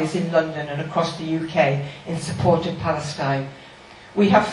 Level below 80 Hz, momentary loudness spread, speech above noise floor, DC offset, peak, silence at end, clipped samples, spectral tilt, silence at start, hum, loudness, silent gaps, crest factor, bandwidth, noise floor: -50 dBFS; 10 LU; 22 dB; under 0.1%; -2 dBFS; 0 s; under 0.1%; -6 dB/octave; 0 s; none; -22 LUFS; none; 20 dB; 11.5 kHz; -44 dBFS